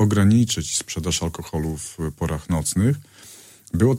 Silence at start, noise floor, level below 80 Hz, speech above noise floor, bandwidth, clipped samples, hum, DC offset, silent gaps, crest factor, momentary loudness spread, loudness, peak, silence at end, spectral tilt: 0 s; -46 dBFS; -40 dBFS; 25 dB; 16.5 kHz; under 0.1%; none; under 0.1%; none; 16 dB; 13 LU; -22 LUFS; -6 dBFS; 0 s; -5 dB/octave